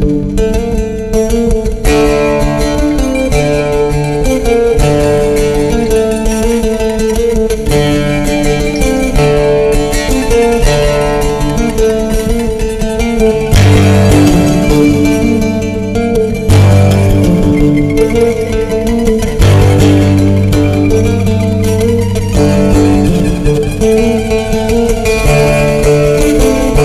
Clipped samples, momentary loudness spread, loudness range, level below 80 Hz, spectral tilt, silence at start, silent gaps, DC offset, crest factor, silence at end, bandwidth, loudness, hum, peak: under 0.1%; 6 LU; 3 LU; -16 dBFS; -6.5 dB/octave; 0 s; none; under 0.1%; 8 dB; 0 s; 15.5 kHz; -10 LUFS; none; 0 dBFS